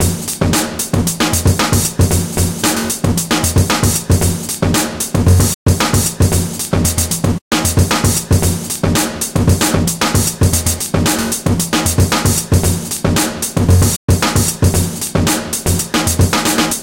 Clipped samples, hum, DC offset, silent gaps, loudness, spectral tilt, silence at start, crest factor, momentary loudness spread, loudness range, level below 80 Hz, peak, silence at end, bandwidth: under 0.1%; none; under 0.1%; 5.54-5.66 s, 7.41-7.51 s, 13.96-14.08 s; -14 LUFS; -4 dB/octave; 0 s; 14 dB; 4 LU; 1 LU; -26 dBFS; 0 dBFS; 0 s; 17.5 kHz